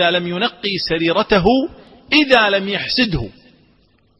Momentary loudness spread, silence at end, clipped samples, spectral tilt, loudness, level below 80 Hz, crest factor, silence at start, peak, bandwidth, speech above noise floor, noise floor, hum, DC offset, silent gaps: 8 LU; 0.9 s; under 0.1%; -6 dB/octave; -16 LUFS; -38 dBFS; 18 dB; 0 s; 0 dBFS; 9.8 kHz; 40 dB; -56 dBFS; none; under 0.1%; none